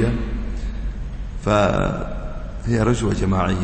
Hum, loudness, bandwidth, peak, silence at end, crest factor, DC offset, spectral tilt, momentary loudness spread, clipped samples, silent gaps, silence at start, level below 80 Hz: none; -22 LUFS; 8.8 kHz; -4 dBFS; 0 s; 16 dB; under 0.1%; -7 dB/octave; 14 LU; under 0.1%; none; 0 s; -28 dBFS